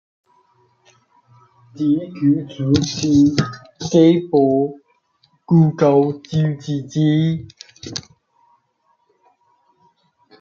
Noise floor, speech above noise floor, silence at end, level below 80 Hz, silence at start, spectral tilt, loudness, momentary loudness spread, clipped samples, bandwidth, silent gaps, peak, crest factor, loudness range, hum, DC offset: -64 dBFS; 48 dB; 2.4 s; -56 dBFS; 1.75 s; -7 dB/octave; -17 LUFS; 16 LU; under 0.1%; 7.2 kHz; none; 0 dBFS; 18 dB; 8 LU; none; under 0.1%